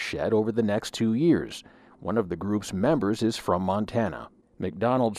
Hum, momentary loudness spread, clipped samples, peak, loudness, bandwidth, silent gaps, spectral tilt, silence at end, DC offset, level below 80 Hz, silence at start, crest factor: none; 11 LU; under 0.1%; -10 dBFS; -26 LUFS; 14 kHz; none; -6.5 dB/octave; 0 s; under 0.1%; -56 dBFS; 0 s; 16 dB